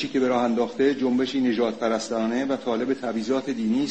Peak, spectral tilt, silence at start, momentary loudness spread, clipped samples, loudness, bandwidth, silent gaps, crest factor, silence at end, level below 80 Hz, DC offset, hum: -10 dBFS; -5 dB/octave; 0 s; 4 LU; under 0.1%; -24 LUFS; 8.6 kHz; none; 14 dB; 0 s; -62 dBFS; 0.2%; none